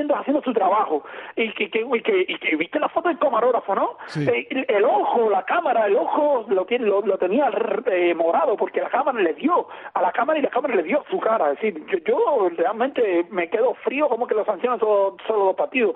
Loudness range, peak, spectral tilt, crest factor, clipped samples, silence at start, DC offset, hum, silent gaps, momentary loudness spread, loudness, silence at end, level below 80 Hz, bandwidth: 2 LU; -8 dBFS; -3 dB/octave; 14 dB; under 0.1%; 0 s; under 0.1%; none; none; 4 LU; -21 LUFS; 0 s; -72 dBFS; 6 kHz